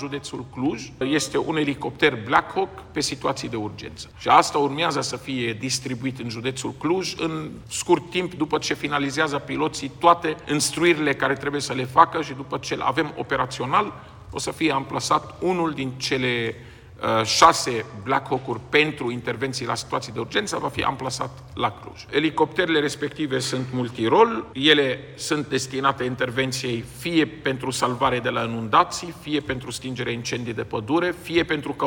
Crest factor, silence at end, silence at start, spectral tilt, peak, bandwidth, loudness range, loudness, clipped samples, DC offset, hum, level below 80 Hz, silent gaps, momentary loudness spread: 24 dB; 0 s; 0 s; -4 dB/octave; 0 dBFS; 17.5 kHz; 4 LU; -23 LUFS; under 0.1%; under 0.1%; none; -52 dBFS; none; 11 LU